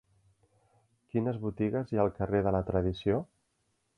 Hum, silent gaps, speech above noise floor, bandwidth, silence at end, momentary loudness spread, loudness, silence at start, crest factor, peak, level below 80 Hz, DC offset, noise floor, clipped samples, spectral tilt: none; none; 47 dB; 6.4 kHz; 0.75 s; 5 LU; -31 LUFS; 1.15 s; 20 dB; -12 dBFS; -50 dBFS; under 0.1%; -77 dBFS; under 0.1%; -9.5 dB/octave